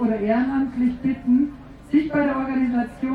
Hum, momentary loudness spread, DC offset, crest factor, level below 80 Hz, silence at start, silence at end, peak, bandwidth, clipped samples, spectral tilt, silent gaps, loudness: 50 Hz at -50 dBFS; 4 LU; under 0.1%; 14 dB; -48 dBFS; 0 s; 0 s; -8 dBFS; 4.9 kHz; under 0.1%; -8.5 dB/octave; none; -22 LUFS